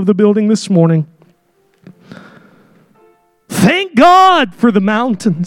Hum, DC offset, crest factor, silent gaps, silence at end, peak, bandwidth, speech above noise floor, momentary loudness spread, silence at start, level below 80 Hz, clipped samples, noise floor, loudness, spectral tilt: none; under 0.1%; 12 dB; none; 0 s; 0 dBFS; 17 kHz; 46 dB; 9 LU; 0 s; -52 dBFS; under 0.1%; -56 dBFS; -11 LUFS; -6 dB/octave